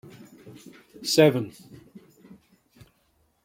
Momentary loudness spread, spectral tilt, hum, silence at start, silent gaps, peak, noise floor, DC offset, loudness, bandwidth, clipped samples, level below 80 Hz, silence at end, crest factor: 28 LU; -5 dB/octave; none; 0.45 s; none; -4 dBFS; -68 dBFS; under 0.1%; -22 LUFS; 16.5 kHz; under 0.1%; -68 dBFS; 1.95 s; 24 dB